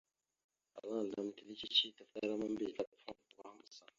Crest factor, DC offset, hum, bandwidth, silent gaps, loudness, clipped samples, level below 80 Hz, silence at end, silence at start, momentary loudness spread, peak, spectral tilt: 24 dB; under 0.1%; none; 7.4 kHz; 2.87-2.92 s; -40 LUFS; under 0.1%; -82 dBFS; 0.2 s; 0.75 s; 24 LU; -18 dBFS; -1.5 dB/octave